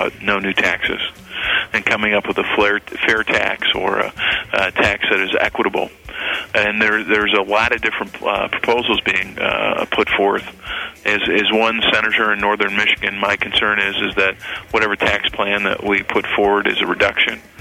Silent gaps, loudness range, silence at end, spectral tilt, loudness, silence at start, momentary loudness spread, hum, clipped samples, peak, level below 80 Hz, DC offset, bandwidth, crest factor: none; 2 LU; 0 s; -4 dB/octave; -16 LUFS; 0 s; 6 LU; none; under 0.1%; -2 dBFS; -44 dBFS; under 0.1%; 16 kHz; 16 dB